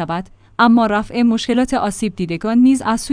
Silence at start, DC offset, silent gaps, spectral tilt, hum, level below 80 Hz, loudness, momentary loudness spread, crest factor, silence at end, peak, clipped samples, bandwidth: 0 s; under 0.1%; none; -5 dB/octave; none; -42 dBFS; -16 LUFS; 10 LU; 16 dB; 0 s; 0 dBFS; under 0.1%; 10.5 kHz